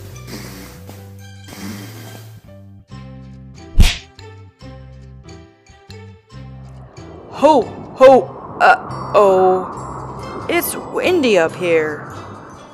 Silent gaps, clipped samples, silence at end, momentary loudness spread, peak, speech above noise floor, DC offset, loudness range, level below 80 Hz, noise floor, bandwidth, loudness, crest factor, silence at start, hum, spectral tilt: none; under 0.1%; 0.2 s; 26 LU; 0 dBFS; 32 dB; under 0.1%; 20 LU; -28 dBFS; -44 dBFS; 15.5 kHz; -15 LUFS; 18 dB; 0 s; none; -5 dB/octave